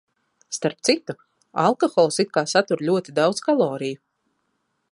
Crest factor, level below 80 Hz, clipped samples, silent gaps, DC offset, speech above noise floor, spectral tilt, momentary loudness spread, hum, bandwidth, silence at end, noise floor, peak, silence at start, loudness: 20 dB; -72 dBFS; under 0.1%; none; under 0.1%; 52 dB; -4 dB/octave; 13 LU; none; 11.5 kHz; 1 s; -73 dBFS; -2 dBFS; 0.5 s; -22 LUFS